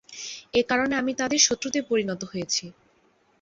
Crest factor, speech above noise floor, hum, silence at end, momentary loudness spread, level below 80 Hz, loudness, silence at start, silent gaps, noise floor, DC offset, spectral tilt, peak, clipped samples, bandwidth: 20 dB; 39 dB; none; 0.7 s; 12 LU; -60 dBFS; -24 LUFS; 0.1 s; none; -64 dBFS; under 0.1%; -2 dB/octave; -6 dBFS; under 0.1%; 8 kHz